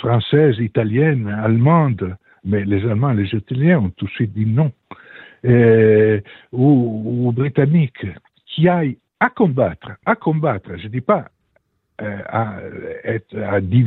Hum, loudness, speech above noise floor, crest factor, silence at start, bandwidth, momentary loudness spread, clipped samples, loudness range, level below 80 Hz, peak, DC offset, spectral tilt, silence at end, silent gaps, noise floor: none; -17 LUFS; 47 dB; 14 dB; 0 s; 4.1 kHz; 14 LU; under 0.1%; 7 LU; -52 dBFS; -2 dBFS; under 0.1%; -11 dB/octave; 0 s; none; -64 dBFS